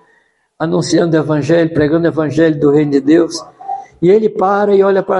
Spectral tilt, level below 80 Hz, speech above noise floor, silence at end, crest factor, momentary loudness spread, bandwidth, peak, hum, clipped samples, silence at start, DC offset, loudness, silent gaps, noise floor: -6.5 dB/octave; -50 dBFS; 44 dB; 0 s; 12 dB; 10 LU; 11.5 kHz; 0 dBFS; none; under 0.1%; 0.6 s; under 0.1%; -12 LUFS; none; -56 dBFS